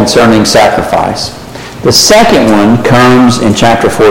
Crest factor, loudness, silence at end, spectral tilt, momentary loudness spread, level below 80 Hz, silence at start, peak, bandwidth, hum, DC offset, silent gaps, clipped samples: 6 dB; -6 LUFS; 0 s; -4 dB/octave; 11 LU; -30 dBFS; 0 s; 0 dBFS; 17.5 kHz; none; under 0.1%; none; 0.8%